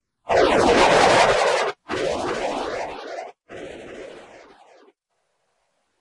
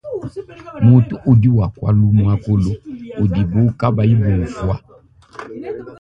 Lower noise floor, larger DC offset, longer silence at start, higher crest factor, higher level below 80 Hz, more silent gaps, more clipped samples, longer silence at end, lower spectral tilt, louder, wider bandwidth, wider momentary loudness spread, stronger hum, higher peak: first, -73 dBFS vs -39 dBFS; neither; first, 0.25 s vs 0.05 s; about the same, 18 dB vs 16 dB; second, -48 dBFS vs -34 dBFS; neither; neither; first, 1.8 s vs 0.05 s; second, -3.5 dB/octave vs -10 dB/octave; second, -19 LUFS vs -15 LUFS; first, 11.5 kHz vs 5.6 kHz; first, 23 LU vs 18 LU; neither; second, -4 dBFS vs 0 dBFS